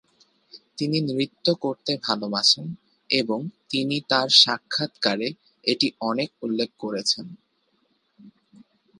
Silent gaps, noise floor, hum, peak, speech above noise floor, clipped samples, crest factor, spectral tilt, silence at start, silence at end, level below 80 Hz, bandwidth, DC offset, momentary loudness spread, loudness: none; -69 dBFS; none; 0 dBFS; 45 dB; under 0.1%; 26 dB; -3.5 dB/octave; 0.55 s; 0.7 s; -72 dBFS; 11.5 kHz; under 0.1%; 12 LU; -23 LUFS